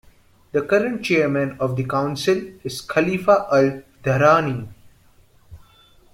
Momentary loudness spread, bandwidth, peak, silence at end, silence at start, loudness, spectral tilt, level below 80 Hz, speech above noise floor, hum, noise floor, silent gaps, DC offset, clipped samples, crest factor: 12 LU; 16.5 kHz; -2 dBFS; 0.55 s; 0.55 s; -20 LUFS; -6 dB/octave; -54 dBFS; 34 dB; none; -53 dBFS; none; under 0.1%; under 0.1%; 20 dB